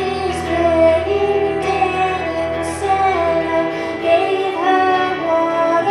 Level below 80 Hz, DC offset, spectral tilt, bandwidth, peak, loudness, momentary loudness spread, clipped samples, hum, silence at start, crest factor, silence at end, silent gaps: -40 dBFS; under 0.1%; -5.5 dB/octave; 12 kHz; -2 dBFS; -17 LUFS; 7 LU; under 0.1%; none; 0 s; 14 dB; 0 s; none